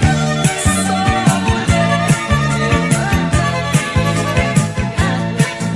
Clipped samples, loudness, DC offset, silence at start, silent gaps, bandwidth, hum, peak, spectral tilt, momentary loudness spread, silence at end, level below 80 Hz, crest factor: under 0.1%; -15 LUFS; under 0.1%; 0 s; none; 12 kHz; none; 0 dBFS; -5 dB/octave; 3 LU; 0 s; -28 dBFS; 14 dB